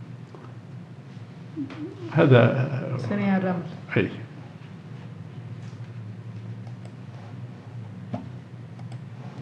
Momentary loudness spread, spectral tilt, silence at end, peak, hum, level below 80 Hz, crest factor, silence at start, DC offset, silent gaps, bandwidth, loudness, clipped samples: 20 LU; -8.5 dB/octave; 0 s; -4 dBFS; none; -74 dBFS; 24 dB; 0 s; under 0.1%; none; 6.8 kHz; -25 LUFS; under 0.1%